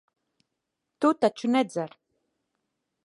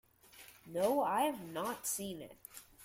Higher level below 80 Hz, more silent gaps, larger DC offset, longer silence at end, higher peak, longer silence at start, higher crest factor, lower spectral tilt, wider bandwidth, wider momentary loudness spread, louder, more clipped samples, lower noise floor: second, -82 dBFS vs -74 dBFS; neither; neither; first, 1.2 s vs 0 s; first, -10 dBFS vs -20 dBFS; first, 1 s vs 0.35 s; about the same, 20 dB vs 18 dB; first, -5.5 dB/octave vs -3.5 dB/octave; second, 11.5 kHz vs 16.5 kHz; second, 11 LU vs 22 LU; first, -26 LUFS vs -36 LUFS; neither; first, -83 dBFS vs -60 dBFS